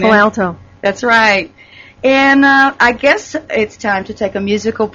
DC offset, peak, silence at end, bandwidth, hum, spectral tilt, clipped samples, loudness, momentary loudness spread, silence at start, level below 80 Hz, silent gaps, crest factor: under 0.1%; 0 dBFS; 0.05 s; 7.6 kHz; none; -4.5 dB/octave; under 0.1%; -12 LUFS; 11 LU; 0 s; -46 dBFS; none; 12 dB